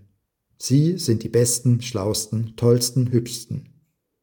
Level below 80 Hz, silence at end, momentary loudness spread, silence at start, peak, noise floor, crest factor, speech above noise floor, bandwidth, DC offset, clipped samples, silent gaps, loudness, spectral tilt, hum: -56 dBFS; 0.6 s; 12 LU; 0.6 s; -4 dBFS; -69 dBFS; 18 dB; 49 dB; 19 kHz; under 0.1%; under 0.1%; none; -21 LUFS; -5.5 dB/octave; none